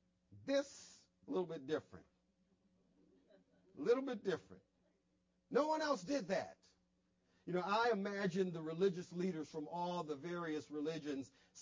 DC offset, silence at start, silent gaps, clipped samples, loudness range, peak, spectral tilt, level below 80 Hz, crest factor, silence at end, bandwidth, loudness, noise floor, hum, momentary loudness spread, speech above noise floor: under 0.1%; 0.3 s; none; under 0.1%; 6 LU; -24 dBFS; -5.5 dB/octave; -82 dBFS; 20 dB; 0 s; 7.6 kHz; -41 LUFS; -81 dBFS; none; 9 LU; 40 dB